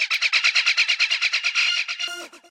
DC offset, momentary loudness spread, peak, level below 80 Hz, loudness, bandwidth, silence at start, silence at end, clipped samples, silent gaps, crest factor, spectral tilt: under 0.1%; 10 LU; -6 dBFS; -84 dBFS; -19 LUFS; 16 kHz; 0 s; 0.15 s; under 0.1%; none; 16 dB; 4.5 dB/octave